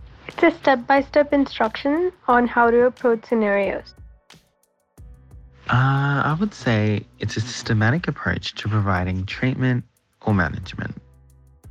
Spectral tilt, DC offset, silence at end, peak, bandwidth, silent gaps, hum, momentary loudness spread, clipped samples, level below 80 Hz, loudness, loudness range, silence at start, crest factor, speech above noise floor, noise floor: -7 dB/octave; under 0.1%; 0 s; -4 dBFS; 9 kHz; none; none; 11 LU; under 0.1%; -48 dBFS; -21 LUFS; 5 LU; 0 s; 16 dB; 46 dB; -66 dBFS